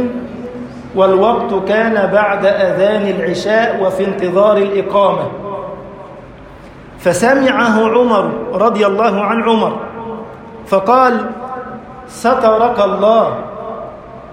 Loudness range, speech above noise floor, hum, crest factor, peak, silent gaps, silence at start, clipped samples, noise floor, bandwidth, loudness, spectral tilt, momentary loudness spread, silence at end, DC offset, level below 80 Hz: 3 LU; 23 dB; none; 14 dB; 0 dBFS; none; 0 s; under 0.1%; -35 dBFS; 15.5 kHz; -13 LUFS; -5.5 dB/octave; 17 LU; 0 s; under 0.1%; -48 dBFS